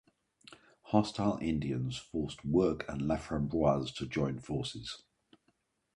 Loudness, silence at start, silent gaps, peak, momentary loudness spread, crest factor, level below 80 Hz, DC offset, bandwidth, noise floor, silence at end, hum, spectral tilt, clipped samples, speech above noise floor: -34 LUFS; 0.5 s; none; -12 dBFS; 8 LU; 22 dB; -54 dBFS; under 0.1%; 11.5 kHz; -76 dBFS; 1 s; none; -6.5 dB/octave; under 0.1%; 44 dB